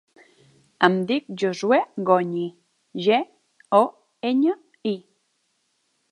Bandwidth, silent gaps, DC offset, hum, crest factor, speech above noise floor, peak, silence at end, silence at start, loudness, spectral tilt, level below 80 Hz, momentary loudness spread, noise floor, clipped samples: 11.5 kHz; none; under 0.1%; none; 24 dB; 50 dB; 0 dBFS; 1.1 s; 0.8 s; -23 LUFS; -6 dB/octave; -76 dBFS; 10 LU; -71 dBFS; under 0.1%